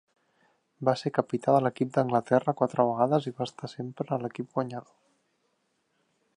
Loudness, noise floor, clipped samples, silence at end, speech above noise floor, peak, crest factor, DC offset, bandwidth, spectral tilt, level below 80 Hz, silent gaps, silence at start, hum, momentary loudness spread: -28 LUFS; -75 dBFS; under 0.1%; 1.55 s; 47 dB; -8 dBFS; 22 dB; under 0.1%; 10.5 kHz; -7.5 dB/octave; -74 dBFS; none; 0.8 s; none; 11 LU